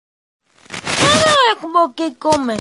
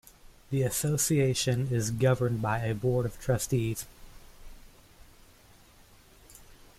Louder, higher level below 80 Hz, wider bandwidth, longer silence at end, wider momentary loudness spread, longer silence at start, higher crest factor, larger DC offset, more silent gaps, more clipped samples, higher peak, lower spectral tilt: first, -14 LUFS vs -29 LUFS; first, -46 dBFS vs -52 dBFS; second, 11.5 kHz vs 15.5 kHz; second, 0 s vs 0.25 s; first, 11 LU vs 6 LU; first, 0.7 s vs 0.5 s; about the same, 16 dB vs 18 dB; neither; neither; neither; first, 0 dBFS vs -14 dBFS; second, -3 dB/octave vs -5 dB/octave